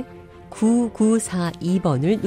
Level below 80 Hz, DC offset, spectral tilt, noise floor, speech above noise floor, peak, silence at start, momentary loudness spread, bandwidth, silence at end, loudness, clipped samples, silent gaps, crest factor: -52 dBFS; under 0.1%; -6.5 dB/octave; -40 dBFS; 20 dB; -8 dBFS; 0 s; 10 LU; 13 kHz; 0 s; -21 LUFS; under 0.1%; none; 14 dB